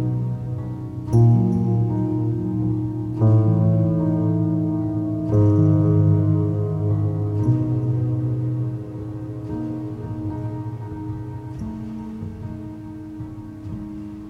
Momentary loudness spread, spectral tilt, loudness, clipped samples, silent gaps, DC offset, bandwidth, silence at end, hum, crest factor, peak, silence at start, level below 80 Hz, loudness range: 16 LU; -11.5 dB/octave; -22 LUFS; under 0.1%; none; under 0.1%; 2.9 kHz; 0 s; none; 16 dB; -6 dBFS; 0 s; -44 dBFS; 12 LU